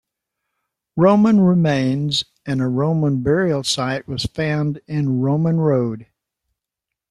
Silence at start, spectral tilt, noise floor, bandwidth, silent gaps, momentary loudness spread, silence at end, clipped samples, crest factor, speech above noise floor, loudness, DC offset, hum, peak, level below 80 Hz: 0.95 s; -6.5 dB/octave; -84 dBFS; 12 kHz; none; 10 LU; 1.05 s; under 0.1%; 16 dB; 66 dB; -18 LUFS; under 0.1%; none; -2 dBFS; -50 dBFS